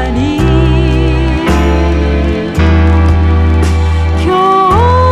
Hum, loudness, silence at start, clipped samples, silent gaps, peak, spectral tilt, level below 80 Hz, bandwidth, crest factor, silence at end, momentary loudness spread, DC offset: none; -10 LUFS; 0 s; under 0.1%; none; 0 dBFS; -7.5 dB/octave; -14 dBFS; 10.5 kHz; 8 dB; 0 s; 4 LU; under 0.1%